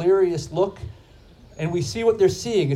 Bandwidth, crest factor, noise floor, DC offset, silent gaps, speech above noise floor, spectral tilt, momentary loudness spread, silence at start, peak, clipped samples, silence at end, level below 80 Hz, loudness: 13 kHz; 14 dB; -48 dBFS; under 0.1%; none; 28 dB; -6 dB/octave; 12 LU; 0 s; -8 dBFS; under 0.1%; 0 s; -48 dBFS; -22 LUFS